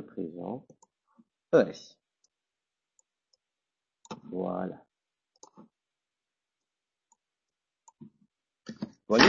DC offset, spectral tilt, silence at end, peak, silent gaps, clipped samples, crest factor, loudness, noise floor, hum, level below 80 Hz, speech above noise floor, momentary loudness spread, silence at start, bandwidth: under 0.1%; -2.5 dB/octave; 0 s; -2 dBFS; none; under 0.1%; 32 dB; -32 LUFS; -90 dBFS; none; -68 dBFS; 60 dB; 25 LU; 0 s; 7.4 kHz